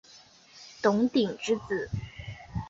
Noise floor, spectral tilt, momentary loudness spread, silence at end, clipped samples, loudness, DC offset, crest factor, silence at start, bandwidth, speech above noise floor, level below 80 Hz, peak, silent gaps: -55 dBFS; -6 dB/octave; 18 LU; 0 s; under 0.1%; -29 LUFS; under 0.1%; 20 dB; 0.15 s; 7.8 kHz; 28 dB; -52 dBFS; -10 dBFS; none